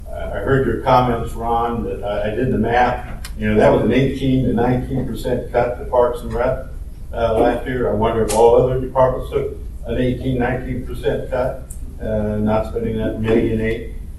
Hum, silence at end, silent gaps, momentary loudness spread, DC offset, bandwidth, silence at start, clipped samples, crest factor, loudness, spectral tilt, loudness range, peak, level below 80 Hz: none; 0 s; none; 11 LU; under 0.1%; 12.5 kHz; 0 s; under 0.1%; 18 dB; -19 LUFS; -7 dB/octave; 4 LU; 0 dBFS; -30 dBFS